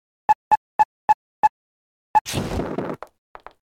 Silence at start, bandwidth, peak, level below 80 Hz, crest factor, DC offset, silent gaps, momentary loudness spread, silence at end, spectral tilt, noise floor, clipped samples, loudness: 0.3 s; 16 kHz; -6 dBFS; -46 dBFS; 18 dB; under 0.1%; 0.35-0.51 s, 0.57-0.79 s, 0.85-1.08 s, 1.14-1.43 s, 1.49-2.14 s, 2.21-2.25 s; 11 LU; 0.75 s; -4.5 dB/octave; under -90 dBFS; under 0.1%; -23 LUFS